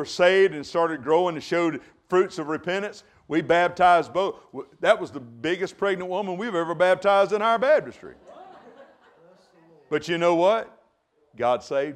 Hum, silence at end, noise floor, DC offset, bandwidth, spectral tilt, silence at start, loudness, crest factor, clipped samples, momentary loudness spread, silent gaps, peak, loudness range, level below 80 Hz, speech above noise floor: none; 0 s; -66 dBFS; under 0.1%; 10.5 kHz; -5 dB/octave; 0 s; -23 LUFS; 20 dB; under 0.1%; 11 LU; none; -4 dBFS; 4 LU; -66 dBFS; 43 dB